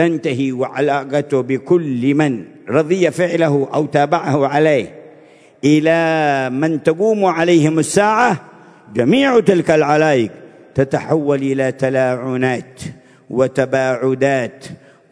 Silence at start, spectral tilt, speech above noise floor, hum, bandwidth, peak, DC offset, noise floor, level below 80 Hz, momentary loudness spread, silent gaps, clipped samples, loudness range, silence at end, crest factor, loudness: 0 s; -6 dB/octave; 30 dB; none; 11 kHz; 0 dBFS; under 0.1%; -45 dBFS; -56 dBFS; 8 LU; none; under 0.1%; 4 LU; 0.35 s; 16 dB; -16 LUFS